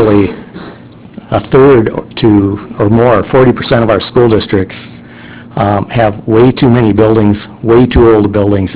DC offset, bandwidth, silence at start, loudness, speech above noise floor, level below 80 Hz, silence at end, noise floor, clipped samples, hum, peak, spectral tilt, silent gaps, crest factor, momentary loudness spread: under 0.1%; 4 kHz; 0 s; -9 LUFS; 23 dB; -28 dBFS; 0 s; -31 dBFS; 2%; none; 0 dBFS; -12 dB/octave; none; 8 dB; 10 LU